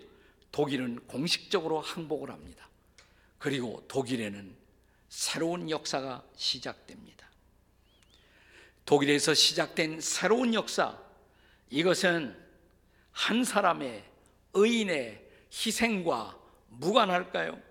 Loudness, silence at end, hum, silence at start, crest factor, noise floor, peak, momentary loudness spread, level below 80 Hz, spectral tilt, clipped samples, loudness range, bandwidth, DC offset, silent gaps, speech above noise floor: -29 LUFS; 0.1 s; none; 0 s; 24 dB; -65 dBFS; -6 dBFS; 17 LU; -66 dBFS; -3 dB/octave; under 0.1%; 8 LU; 18.5 kHz; under 0.1%; none; 35 dB